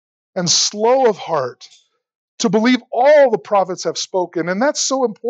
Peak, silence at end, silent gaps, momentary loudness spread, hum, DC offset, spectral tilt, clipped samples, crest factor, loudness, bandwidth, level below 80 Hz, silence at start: -4 dBFS; 0 s; 2.15-2.38 s; 9 LU; none; under 0.1%; -3 dB/octave; under 0.1%; 14 dB; -16 LUFS; 9 kHz; -82 dBFS; 0.35 s